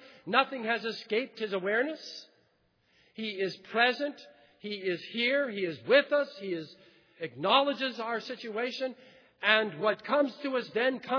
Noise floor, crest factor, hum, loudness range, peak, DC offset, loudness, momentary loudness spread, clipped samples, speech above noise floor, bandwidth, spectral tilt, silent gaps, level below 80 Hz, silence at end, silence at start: -71 dBFS; 24 dB; none; 5 LU; -8 dBFS; under 0.1%; -30 LUFS; 13 LU; under 0.1%; 41 dB; 5.4 kHz; -5 dB/octave; none; -88 dBFS; 0 s; 0 s